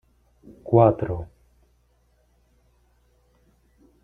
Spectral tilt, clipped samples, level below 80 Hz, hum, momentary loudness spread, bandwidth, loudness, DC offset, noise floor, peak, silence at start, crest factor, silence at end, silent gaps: -11.5 dB/octave; under 0.1%; -52 dBFS; 60 Hz at -55 dBFS; 26 LU; 3.8 kHz; -21 LUFS; under 0.1%; -64 dBFS; -2 dBFS; 0.65 s; 24 dB; 2.8 s; none